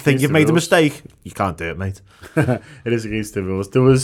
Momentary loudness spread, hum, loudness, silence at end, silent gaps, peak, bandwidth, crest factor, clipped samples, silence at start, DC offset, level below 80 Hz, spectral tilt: 14 LU; none; -19 LUFS; 0 s; none; -2 dBFS; 16 kHz; 16 dB; under 0.1%; 0 s; under 0.1%; -46 dBFS; -6 dB/octave